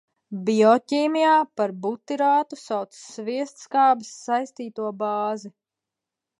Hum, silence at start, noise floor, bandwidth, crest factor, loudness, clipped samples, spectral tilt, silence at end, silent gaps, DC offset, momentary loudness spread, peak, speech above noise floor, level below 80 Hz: none; 0.3 s; -87 dBFS; 11.5 kHz; 20 dB; -23 LUFS; under 0.1%; -5 dB/octave; 0.9 s; none; under 0.1%; 13 LU; -4 dBFS; 64 dB; -80 dBFS